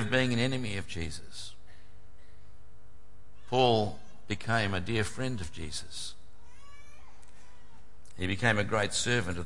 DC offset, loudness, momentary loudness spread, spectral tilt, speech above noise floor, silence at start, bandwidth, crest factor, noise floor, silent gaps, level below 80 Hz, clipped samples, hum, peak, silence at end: 2%; -31 LUFS; 15 LU; -4.5 dB/octave; 27 dB; 0 s; 11.5 kHz; 22 dB; -58 dBFS; none; -56 dBFS; under 0.1%; none; -12 dBFS; 0 s